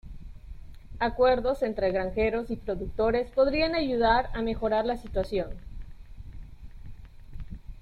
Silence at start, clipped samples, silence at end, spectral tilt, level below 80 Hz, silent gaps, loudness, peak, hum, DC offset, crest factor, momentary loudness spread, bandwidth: 0.05 s; under 0.1%; 0 s; -7 dB/octave; -40 dBFS; none; -27 LUFS; -10 dBFS; none; under 0.1%; 20 dB; 24 LU; 11.5 kHz